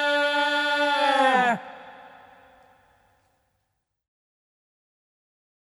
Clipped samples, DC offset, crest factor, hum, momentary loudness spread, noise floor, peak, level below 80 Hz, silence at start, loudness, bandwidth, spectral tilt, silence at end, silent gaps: under 0.1%; under 0.1%; 20 dB; none; 15 LU; -78 dBFS; -8 dBFS; -78 dBFS; 0 s; -22 LUFS; 13 kHz; -3 dB/octave; 3.65 s; none